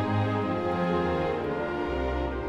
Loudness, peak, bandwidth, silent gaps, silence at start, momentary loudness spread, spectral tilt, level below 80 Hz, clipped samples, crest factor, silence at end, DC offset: -28 LUFS; -16 dBFS; 9 kHz; none; 0 s; 3 LU; -8 dB/octave; -40 dBFS; under 0.1%; 12 dB; 0 s; under 0.1%